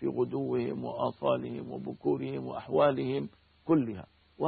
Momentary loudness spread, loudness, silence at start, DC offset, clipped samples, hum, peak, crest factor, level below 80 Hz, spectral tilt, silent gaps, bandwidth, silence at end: 12 LU; -31 LUFS; 0 s; under 0.1%; under 0.1%; none; -14 dBFS; 18 dB; -66 dBFS; -11 dB/octave; none; 4.7 kHz; 0 s